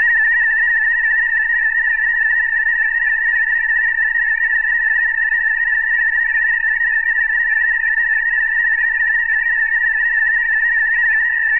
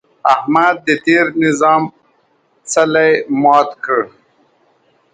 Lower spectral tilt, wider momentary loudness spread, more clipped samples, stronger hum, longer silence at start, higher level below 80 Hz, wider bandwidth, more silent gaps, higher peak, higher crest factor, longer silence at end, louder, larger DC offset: about the same, -3.5 dB/octave vs -4.5 dB/octave; second, 1 LU vs 6 LU; neither; neither; second, 0 s vs 0.25 s; first, -44 dBFS vs -64 dBFS; second, 3.1 kHz vs 9.6 kHz; neither; second, -8 dBFS vs 0 dBFS; second, 8 dB vs 14 dB; second, 0 s vs 1.05 s; about the same, -14 LUFS vs -13 LUFS; neither